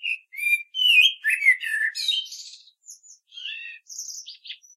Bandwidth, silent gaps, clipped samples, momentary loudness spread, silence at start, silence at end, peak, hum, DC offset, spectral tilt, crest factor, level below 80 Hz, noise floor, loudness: 16 kHz; none; under 0.1%; 22 LU; 0 s; 0.2 s; -6 dBFS; none; under 0.1%; 10.5 dB/octave; 20 dB; under -90 dBFS; -49 dBFS; -19 LUFS